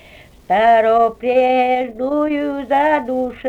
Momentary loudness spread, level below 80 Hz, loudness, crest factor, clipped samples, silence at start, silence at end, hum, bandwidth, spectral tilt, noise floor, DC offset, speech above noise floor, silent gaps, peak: 8 LU; -48 dBFS; -16 LUFS; 12 dB; under 0.1%; 0.5 s; 0 s; none; 8.6 kHz; -6 dB/octave; -42 dBFS; under 0.1%; 27 dB; none; -4 dBFS